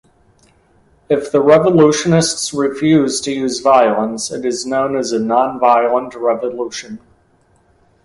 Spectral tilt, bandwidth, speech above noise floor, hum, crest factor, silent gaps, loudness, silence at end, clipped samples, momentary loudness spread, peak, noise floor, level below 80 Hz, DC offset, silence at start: -5 dB/octave; 11.5 kHz; 41 dB; none; 16 dB; none; -15 LUFS; 1.1 s; under 0.1%; 10 LU; 0 dBFS; -55 dBFS; -52 dBFS; under 0.1%; 1.1 s